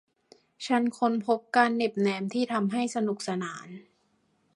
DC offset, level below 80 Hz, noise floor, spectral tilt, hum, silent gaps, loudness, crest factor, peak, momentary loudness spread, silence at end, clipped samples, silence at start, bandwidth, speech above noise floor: under 0.1%; -76 dBFS; -70 dBFS; -5 dB/octave; none; none; -28 LUFS; 22 dB; -8 dBFS; 15 LU; 0.75 s; under 0.1%; 0.6 s; 11 kHz; 43 dB